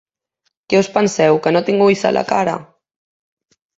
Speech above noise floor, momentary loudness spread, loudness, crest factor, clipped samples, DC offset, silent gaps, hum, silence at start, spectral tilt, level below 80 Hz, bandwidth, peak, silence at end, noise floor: 56 dB; 5 LU; -15 LUFS; 16 dB; under 0.1%; under 0.1%; none; none; 0.7 s; -5 dB/octave; -58 dBFS; 8 kHz; -2 dBFS; 1.15 s; -70 dBFS